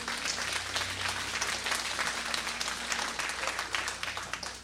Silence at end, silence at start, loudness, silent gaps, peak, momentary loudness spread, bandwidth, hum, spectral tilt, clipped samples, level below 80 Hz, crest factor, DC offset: 0 s; 0 s; -32 LUFS; none; -12 dBFS; 3 LU; 16 kHz; 60 Hz at -55 dBFS; -0.5 dB/octave; under 0.1%; -56 dBFS; 22 dB; under 0.1%